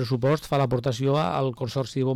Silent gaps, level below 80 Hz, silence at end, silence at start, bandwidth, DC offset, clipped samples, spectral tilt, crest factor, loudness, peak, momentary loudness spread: none; -52 dBFS; 0 s; 0 s; 14 kHz; under 0.1%; under 0.1%; -7 dB/octave; 10 dB; -25 LUFS; -14 dBFS; 4 LU